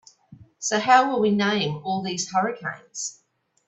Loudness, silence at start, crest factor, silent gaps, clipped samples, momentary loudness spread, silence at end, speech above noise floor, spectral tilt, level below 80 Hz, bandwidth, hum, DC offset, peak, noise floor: -23 LUFS; 0.3 s; 20 dB; none; under 0.1%; 14 LU; 0.55 s; 28 dB; -3.5 dB/octave; -66 dBFS; 8.4 kHz; none; under 0.1%; -4 dBFS; -51 dBFS